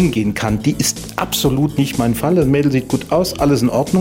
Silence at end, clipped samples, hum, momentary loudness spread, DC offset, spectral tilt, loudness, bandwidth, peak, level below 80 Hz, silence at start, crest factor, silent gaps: 0 s; under 0.1%; none; 4 LU; under 0.1%; -5.5 dB/octave; -16 LUFS; 16.5 kHz; -2 dBFS; -36 dBFS; 0 s; 14 dB; none